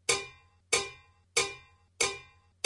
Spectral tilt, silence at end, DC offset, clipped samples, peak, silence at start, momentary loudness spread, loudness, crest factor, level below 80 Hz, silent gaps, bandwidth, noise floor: 0 dB/octave; 0.4 s; under 0.1%; under 0.1%; -8 dBFS; 0.1 s; 16 LU; -31 LUFS; 26 dB; -64 dBFS; none; 11.5 kHz; -52 dBFS